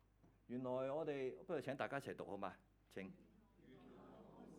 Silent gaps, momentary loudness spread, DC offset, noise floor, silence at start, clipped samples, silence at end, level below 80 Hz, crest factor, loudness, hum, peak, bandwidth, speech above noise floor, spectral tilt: none; 20 LU; under 0.1%; -70 dBFS; 0.25 s; under 0.1%; 0 s; -78 dBFS; 22 dB; -48 LUFS; none; -28 dBFS; 18 kHz; 23 dB; -6.5 dB/octave